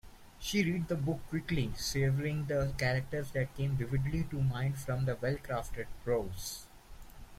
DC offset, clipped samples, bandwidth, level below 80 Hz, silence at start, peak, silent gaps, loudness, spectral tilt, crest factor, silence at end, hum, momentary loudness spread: under 0.1%; under 0.1%; 16 kHz; -48 dBFS; 0.05 s; -16 dBFS; none; -35 LUFS; -6 dB/octave; 18 dB; 0 s; none; 8 LU